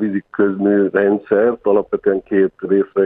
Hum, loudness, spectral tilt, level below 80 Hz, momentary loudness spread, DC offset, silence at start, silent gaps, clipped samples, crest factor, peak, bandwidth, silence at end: none; -16 LUFS; -11.5 dB/octave; -58 dBFS; 4 LU; under 0.1%; 0 s; none; under 0.1%; 14 dB; -2 dBFS; 3.7 kHz; 0 s